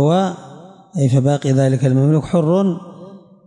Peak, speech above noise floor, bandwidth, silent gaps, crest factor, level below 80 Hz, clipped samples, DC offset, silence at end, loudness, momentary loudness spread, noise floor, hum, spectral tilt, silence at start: -6 dBFS; 24 dB; 10.5 kHz; none; 12 dB; -54 dBFS; under 0.1%; under 0.1%; 0.3 s; -16 LUFS; 14 LU; -39 dBFS; none; -8 dB/octave; 0 s